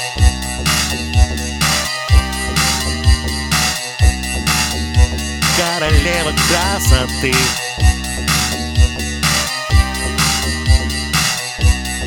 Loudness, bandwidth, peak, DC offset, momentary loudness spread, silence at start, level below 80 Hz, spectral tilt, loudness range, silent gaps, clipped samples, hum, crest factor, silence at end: -15 LUFS; 19.5 kHz; 0 dBFS; under 0.1%; 3 LU; 0 s; -18 dBFS; -3.5 dB/octave; 1 LU; none; under 0.1%; none; 16 dB; 0 s